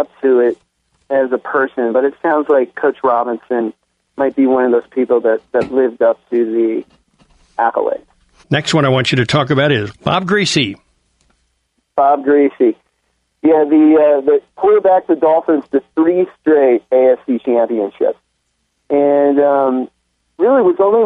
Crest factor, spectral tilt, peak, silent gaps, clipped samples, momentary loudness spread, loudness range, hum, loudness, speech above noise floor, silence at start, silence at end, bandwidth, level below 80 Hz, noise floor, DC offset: 12 dB; -6 dB/octave; -2 dBFS; none; under 0.1%; 8 LU; 4 LU; none; -14 LUFS; 53 dB; 0 s; 0 s; 11 kHz; -56 dBFS; -66 dBFS; under 0.1%